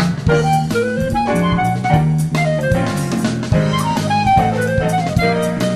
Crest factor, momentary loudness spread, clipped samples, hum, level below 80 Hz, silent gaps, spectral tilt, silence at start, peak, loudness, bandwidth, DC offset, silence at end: 14 dB; 4 LU; under 0.1%; none; -32 dBFS; none; -6.5 dB/octave; 0 s; 0 dBFS; -16 LUFS; 14.5 kHz; 0.3%; 0 s